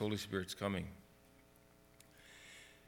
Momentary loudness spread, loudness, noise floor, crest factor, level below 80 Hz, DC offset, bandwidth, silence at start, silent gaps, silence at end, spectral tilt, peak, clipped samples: 25 LU; -42 LUFS; -66 dBFS; 22 dB; -68 dBFS; under 0.1%; 19 kHz; 0 s; none; 0 s; -5 dB/octave; -22 dBFS; under 0.1%